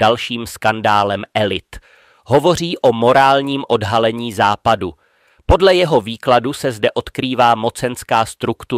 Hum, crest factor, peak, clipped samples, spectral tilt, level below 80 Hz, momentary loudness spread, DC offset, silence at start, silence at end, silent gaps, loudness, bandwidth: none; 14 dB; -2 dBFS; under 0.1%; -5 dB/octave; -34 dBFS; 9 LU; under 0.1%; 0 s; 0 s; none; -15 LUFS; 16 kHz